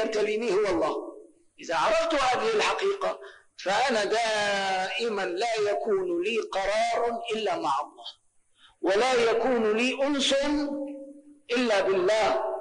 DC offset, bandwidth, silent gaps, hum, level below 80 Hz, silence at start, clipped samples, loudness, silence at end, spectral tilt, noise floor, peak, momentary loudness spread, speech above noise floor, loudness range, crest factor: under 0.1%; 10 kHz; none; none; -58 dBFS; 0 s; under 0.1%; -26 LUFS; 0 s; -3 dB/octave; -61 dBFS; -16 dBFS; 10 LU; 35 dB; 2 LU; 10 dB